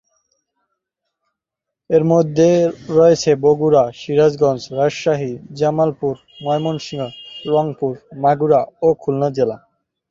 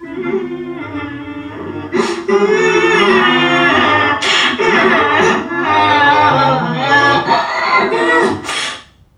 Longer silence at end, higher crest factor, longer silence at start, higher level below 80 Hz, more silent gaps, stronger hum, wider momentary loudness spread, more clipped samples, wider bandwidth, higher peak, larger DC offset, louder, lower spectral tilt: first, 0.55 s vs 0.35 s; about the same, 16 dB vs 14 dB; first, 1.9 s vs 0 s; second, -56 dBFS vs -50 dBFS; neither; neither; second, 11 LU vs 14 LU; neither; second, 7.6 kHz vs 11.5 kHz; about the same, -2 dBFS vs 0 dBFS; neither; second, -17 LUFS vs -12 LUFS; first, -6.5 dB/octave vs -4 dB/octave